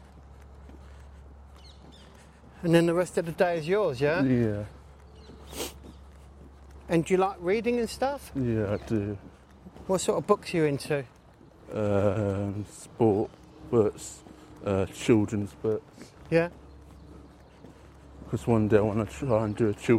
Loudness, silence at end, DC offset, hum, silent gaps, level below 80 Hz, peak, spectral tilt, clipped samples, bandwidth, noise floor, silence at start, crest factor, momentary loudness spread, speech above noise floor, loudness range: -28 LUFS; 0 s; under 0.1%; none; none; -52 dBFS; -8 dBFS; -6.5 dB/octave; under 0.1%; 16 kHz; -54 dBFS; 0.15 s; 22 dB; 18 LU; 27 dB; 4 LU